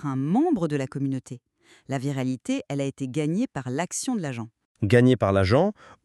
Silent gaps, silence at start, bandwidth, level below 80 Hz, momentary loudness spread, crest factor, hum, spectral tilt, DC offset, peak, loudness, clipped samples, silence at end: 4.65-4.75 s; 0 s; 12.5 kHz; -58 dBFS; 13 LU; 20 dB; none; -6.5 dB/octave; under 0.1%; -4 dBFS; -25 LUFS; under 0.1%; 0.1 s